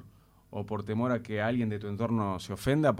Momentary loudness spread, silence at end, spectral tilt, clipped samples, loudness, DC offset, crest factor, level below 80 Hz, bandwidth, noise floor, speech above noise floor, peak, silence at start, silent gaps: 7 LU; 0 s; -7 dB/octave; under 0.1%; -31 LUFS; under 0.1%; 18 dB; -58 dBFS; 16 kHz; -58 dBFS; 28 dB; -12 dBFS; 0 s; none